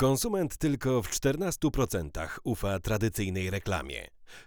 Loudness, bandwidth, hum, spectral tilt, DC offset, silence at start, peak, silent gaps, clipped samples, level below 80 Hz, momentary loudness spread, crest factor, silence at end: -30 LUFS; over 20 kHz; none; -5 dB/octave; under 0.1%; 0 s; -12 dBFS; none; under 0.1%; -44 dBFS; 8 LU; 16 dB; 0.05 s